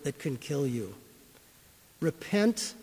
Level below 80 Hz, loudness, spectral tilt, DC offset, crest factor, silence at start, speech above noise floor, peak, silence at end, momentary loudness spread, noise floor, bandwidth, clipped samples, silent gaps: -66 dBFS; -31 LUFS; -5 dB/octave; under 0.1%; 18 dB; 0 s; 28 dB; -14 dBFS; 0 s; 12 LU; -58 dBFS; 16 kHz; under 0.1%; none